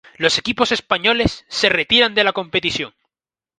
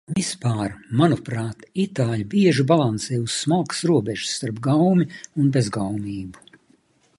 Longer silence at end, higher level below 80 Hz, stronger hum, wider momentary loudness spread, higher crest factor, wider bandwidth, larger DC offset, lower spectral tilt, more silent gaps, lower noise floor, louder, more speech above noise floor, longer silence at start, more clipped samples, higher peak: second, 0.7 s vs 0.85 s; first, -44 dBFS vs -54 dBFS; neither; second, 7 LU vs 10 LU; about the same, 20 dB vs 18 dB; about the same, 11 kHz vs 11.5 kHz; neither; second, -3 dB/octave vs -6 dB/octave; neither; first, under -90 dBFS vs -60 dBFS; first, -17 LUFS vs -22 LUFS; first, over 72 dB vs 39 dB; about the same, 0.2 s vs 0.1 s; neither; first, 0 dBFS vs -4 dBFS